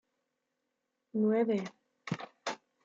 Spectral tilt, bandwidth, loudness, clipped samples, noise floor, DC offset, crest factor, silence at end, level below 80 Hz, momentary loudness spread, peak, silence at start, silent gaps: -6.5 dB/octave; 7.8 kHz; -34 LUFS; under 0.1%; -84 dBFS; under 0.1%; 16 dB; 0.3 s; -82 dBFS; 14 LU; -20 dBFS; 1.15 s; none